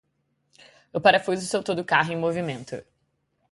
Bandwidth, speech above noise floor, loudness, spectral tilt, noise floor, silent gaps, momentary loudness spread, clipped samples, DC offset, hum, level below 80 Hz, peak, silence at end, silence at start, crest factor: 11.5 kHz; 49 dB; -23 LUFS; -4.5 dB/octave; -73 dBFS; none; 16 LU; under 0.1%; under 0.1%; none; -64 dBFS; -4 dBFS; 0.7 s; 0.95 s; 22 dB